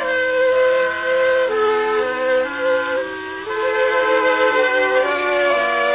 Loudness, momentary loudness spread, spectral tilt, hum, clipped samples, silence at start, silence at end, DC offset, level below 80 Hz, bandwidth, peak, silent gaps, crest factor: -17 LUFS; 6 LU; -6.5 dB/octave; none; under 0.1%; 0 s; 0 s; under 0.1%; -56 dBFS; 4 kHz; -4 dBFS; none; 12 dB